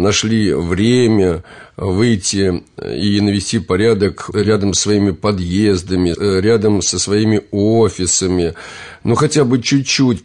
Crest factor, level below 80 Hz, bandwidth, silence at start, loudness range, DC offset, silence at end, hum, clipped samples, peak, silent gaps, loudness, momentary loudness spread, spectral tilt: 12 dB; -44 dBFS; 10.5 kHz; 0 s; 1 LU; under 0.1%; 0.05 s; none; under 0.1%; -2 dBFS; none; -15 LUFS; 6 LU; -5 dB/octave